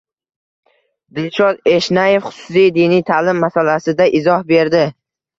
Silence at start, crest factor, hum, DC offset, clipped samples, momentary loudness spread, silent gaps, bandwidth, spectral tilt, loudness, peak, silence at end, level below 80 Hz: 1.15 s; 14 dB; none; under 0.1%; under 0.1%; 6 LU; none; 7.6 kHz; -6 dB/octave; -14 LUFS; 0 dBFS; 0.5 s; -56 dBFS